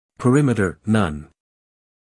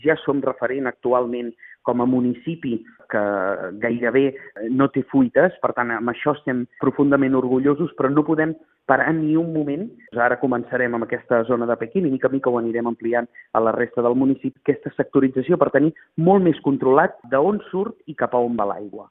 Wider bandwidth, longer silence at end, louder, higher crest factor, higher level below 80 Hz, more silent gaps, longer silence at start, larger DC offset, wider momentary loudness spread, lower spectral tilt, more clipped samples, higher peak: first, 12 kHz vs 3.8 kHz; first, 0.85 s vs 0.1 s; about the same, -19 LUFS vs -21 LUFS; about the same, 18 dB vs 20 dB; first, -48 dBFS vs -62 dBFS; neither; first, 0.2 s vs 0.05 s; neither; about the same, 8 LU vs 9 LU; second, -7 dB/octave vs -12 dB/octave; neither; second, -4 dBFS vs 0 dBFS